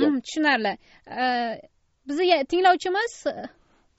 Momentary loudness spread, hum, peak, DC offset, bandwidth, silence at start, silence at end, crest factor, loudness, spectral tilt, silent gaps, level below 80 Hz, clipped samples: 18 LU; none; -6 dBFS; under 0.1%; 8 kHz; 0 s; 0.5 s; 18 dB; -23 LUFS; -1 dB/octave; none; -64 dBFS; under 0.1%